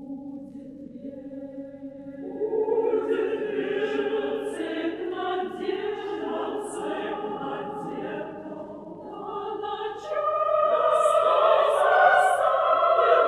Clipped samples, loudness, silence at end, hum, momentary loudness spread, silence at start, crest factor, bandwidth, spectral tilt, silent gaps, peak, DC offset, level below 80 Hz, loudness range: under 0.1%; -25 LUFS; 0 s; none; 19 LU; 0 s; 18 dB; 12.5 kHz; -4.5 dB/octave; none; -6 dBFS; under 0.1%; -66 dBFS; 11 LU